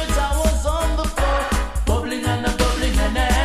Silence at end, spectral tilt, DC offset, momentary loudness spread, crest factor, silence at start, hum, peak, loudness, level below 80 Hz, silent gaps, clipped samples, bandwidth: 0 s; -4.5 dB/octave; under 0.1%; 3 LU; 14 dB; 0 s; none; -6 dBFS; -21 LUFS; -22 dBFS; none; under 0.1%; 15.5 kHz